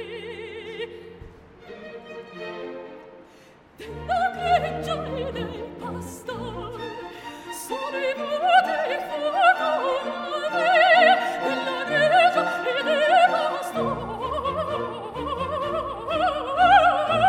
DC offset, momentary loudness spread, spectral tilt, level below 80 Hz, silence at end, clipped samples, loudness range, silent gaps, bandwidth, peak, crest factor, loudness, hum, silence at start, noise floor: under 0.1%; 19 LU; -4 dB/octave; -50 dBFS; 0 s; under 0.1%; 13 LU; none; 16 kHz; -4 dBFS; 20 dB; -22 LUFS; none; 0 s; -51 dBFS